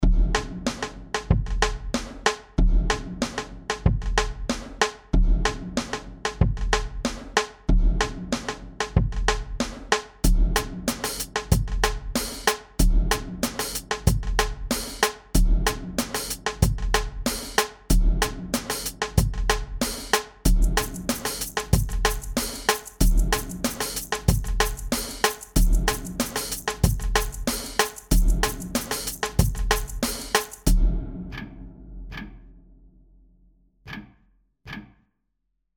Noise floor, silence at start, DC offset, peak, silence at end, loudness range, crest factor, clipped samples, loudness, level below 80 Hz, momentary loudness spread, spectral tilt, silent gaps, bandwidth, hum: -77 dBFS; 0 s; under 0.1%; -4 dBFS; 0.9 s; 3 LU; 20 dB; under 0.1%; -26 LUFS; -26 dBFS; 8 LU; -4 dB/octave; none; over 20 kHz; none